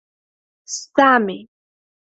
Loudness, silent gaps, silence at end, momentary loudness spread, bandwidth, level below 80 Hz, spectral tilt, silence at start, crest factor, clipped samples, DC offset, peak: -16 LUFS; none; 0.75 s; 16 LU; 8.4 kHz; -68 dBFS; -3.5 dB/octave; 0.7 s; 20 dB; under 0.1%; under 0.1%; 0 dBFS